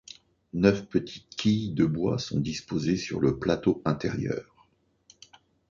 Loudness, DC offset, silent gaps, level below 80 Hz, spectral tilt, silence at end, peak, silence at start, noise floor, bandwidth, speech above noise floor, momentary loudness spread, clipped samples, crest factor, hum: -28 LUFS; under 0.1%; none; -52 dBFS; -6.5 dB/octave; 1.3 s; -6 dBFS; 0.55 s; -65 dBFS; 7.6 kHz; 39 dB; 9 LU; under 0.1%; 22 dB; none